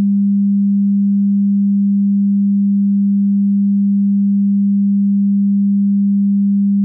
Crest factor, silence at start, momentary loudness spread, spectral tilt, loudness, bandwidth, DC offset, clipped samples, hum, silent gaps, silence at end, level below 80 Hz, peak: 4 dB; 0 s; 0 LU; -17 dB/octave; -14 LUFS; 0.3 kHz; under 0.1%; under 0.1%; none; none; 0 s; -72 dBFS; -10 dBFS